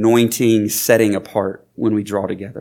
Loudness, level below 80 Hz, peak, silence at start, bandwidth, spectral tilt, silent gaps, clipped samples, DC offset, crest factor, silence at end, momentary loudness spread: -17 LUFS; -62 dBFS; 0 dBFS; 0 s; 19 kHz; -5 dB/octave; none; under 0.1%; under 0.1%; 16 dB; 0 s; 8 LU